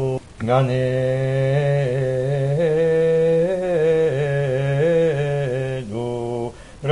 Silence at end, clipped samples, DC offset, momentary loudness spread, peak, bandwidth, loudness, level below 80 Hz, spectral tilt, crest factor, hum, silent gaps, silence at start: 0 s; under 0.1%; 0.3%; 9 LU; -6 dBFS; 11 kHz; -20 LUFS; -48 dBFS; -8 dB/octave; 14 dB; none; none; 0 s